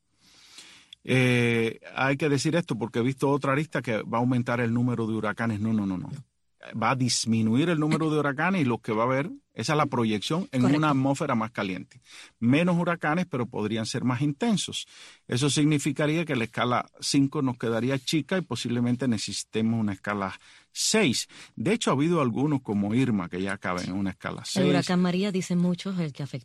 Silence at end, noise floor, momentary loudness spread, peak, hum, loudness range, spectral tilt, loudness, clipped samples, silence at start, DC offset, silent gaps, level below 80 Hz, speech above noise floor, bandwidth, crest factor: 0.05 s; -58 dBFS; 8 LU; -8 dBFS; none; 2 LU; -5 dB/octave; -26 LUFS; under 0.1%; 0.55 s; under 0.1%; none; -64 dBFS; 32 dB; 12.5 kHz; 18 dB